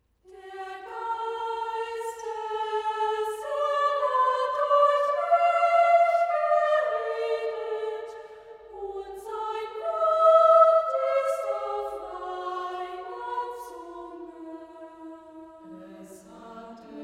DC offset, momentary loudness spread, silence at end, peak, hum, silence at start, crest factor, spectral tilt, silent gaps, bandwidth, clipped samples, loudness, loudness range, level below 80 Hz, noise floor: under 0.1%; 24 LU; 0 s; -6 dBFS; none; 0.3 s; 20 dB; -3 dB/octave; none; 12.5 kHz; under 0.1%; -25 LUFS; 15 LU; -68 dBFS; -49 dBFS